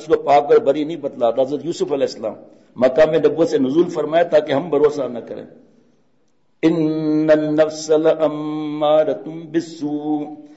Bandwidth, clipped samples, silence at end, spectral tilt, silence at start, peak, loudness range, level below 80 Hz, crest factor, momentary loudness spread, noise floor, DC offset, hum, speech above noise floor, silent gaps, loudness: 8 kHz; under 0.1%; 0.05 s; -6 dB/octave; 0 s; -4 dBFS; 3 LU; -60 dBFS; 14 dB; 10 LU; -65 dBFS; under 0.1%; none; 48 dB; none; -18 LUFS